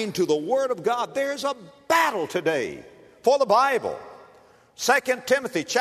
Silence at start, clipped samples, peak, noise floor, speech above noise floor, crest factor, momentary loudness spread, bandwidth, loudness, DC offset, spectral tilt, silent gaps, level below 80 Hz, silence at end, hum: 0 s; under 0.1%; -6 dBFS; -54 dBFS; 31 dB; 18 dB; 11 LU; 13.5 kHz; -23 LUFS; under 0.1%; -3 dB/octave; none; -68 dBFS; 0 s; none